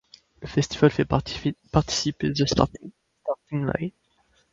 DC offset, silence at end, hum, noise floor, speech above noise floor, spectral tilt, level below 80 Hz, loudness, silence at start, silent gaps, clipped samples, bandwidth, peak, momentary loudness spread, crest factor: under 0.1%; 0.65 s; none; -65 dBFS; 41 dB; -5.5 dB/octave; -44 dBFS; -25 LUFS; 0.4 s; none; under 0.1%; 7.8 kHz; 0 dBFS; 12 LU; 26 dB